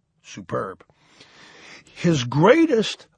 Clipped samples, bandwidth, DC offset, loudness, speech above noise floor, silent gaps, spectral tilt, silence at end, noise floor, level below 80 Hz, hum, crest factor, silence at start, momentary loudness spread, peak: under 0.1%; 9.8 kHz; under 0.1%; -20 LUFS; 25 dB; none; -6 dB/octave; 0.25 s; -46 dBFS; -58 dBFS; none; 20 dB; 0.3 s; 20 LU; -2 dBFS